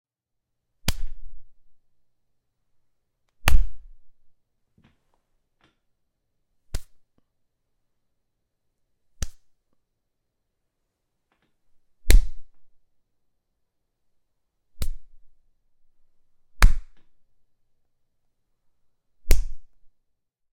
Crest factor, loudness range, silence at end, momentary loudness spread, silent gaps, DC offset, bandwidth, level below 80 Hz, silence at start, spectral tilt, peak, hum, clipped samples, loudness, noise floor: 24 dB; 17 LU; 0.9 s; 19 LU; none; under 0.1%; 15.5 kHz; -30 dBFS; 0.85 s; -3.5 dB/octave; -2 dBFS; none; under 0.1%; -28 LUFS; -81 dBFS